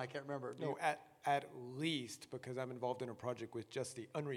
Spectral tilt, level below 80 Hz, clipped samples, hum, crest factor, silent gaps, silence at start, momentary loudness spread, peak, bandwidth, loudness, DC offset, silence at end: -5 dB/octave; -86 dBFS; under 0.1%; none; 22 dB; none; 0 s; 8 LU; -22 dBFS; 16.5 kHz; -43 LUFS; under 0.1%; 0 s